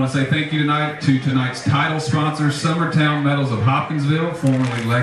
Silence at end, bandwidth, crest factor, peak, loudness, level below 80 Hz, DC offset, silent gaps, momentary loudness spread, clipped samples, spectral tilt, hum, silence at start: 0 s; 11.5 kHz; 14 dB; -4 dBFS; -19 LUFS; -54 dBFS; under 0.1%; none; 3 LU; under 0.1%; -6 dB/octave; none; 0 s